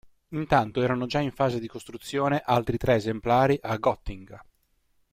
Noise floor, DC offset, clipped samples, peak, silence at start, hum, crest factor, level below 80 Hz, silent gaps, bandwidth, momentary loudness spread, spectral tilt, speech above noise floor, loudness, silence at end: -70 dBFS; under 0.1%; under 0.1%; -8 dBFS; 0.3 s; none; 20 dB; -48 dBFS; none; 16 kHz; 14 LU; -6.5 dB/octave; 44 dB; -26 LUFS; 0.7 s